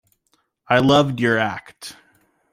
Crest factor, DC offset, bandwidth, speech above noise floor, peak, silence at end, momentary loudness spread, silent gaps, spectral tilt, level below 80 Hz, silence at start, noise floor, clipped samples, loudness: 18 dB; under 0.1%; 15.5 kHz; 49 dB; -2 dBFS; 0.6 s; 22 LU; none; -5.5 dB/octave; -54 dBFS; 0.7 s; -67 dBFS; under 0.1%; -18 LUFS